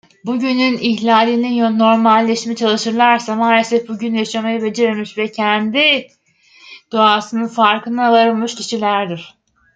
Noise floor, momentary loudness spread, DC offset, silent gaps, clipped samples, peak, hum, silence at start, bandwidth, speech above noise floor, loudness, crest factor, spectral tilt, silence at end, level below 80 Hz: -49 dBFS; 8 LU; under 0.1%; none; under 0.1%; 0 dBFS; none; 0.25 s; 9 kHz; 34 dB; -15 LUFS; 16 dB; -4 dB/octave; 0.45 s; -66 dBFS